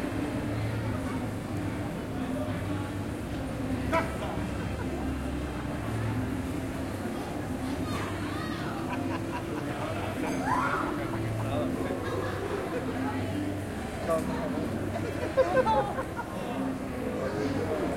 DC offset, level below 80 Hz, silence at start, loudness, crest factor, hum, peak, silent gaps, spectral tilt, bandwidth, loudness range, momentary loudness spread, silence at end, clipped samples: under 0.1%; -46 dBFS; 0 s; -32 LUFS; 18 dB; none; -12 dBFS; none; -6.5 dB/octave; 16.5 kHz; 3 LU; 6 LU; 0 s; under 0.1%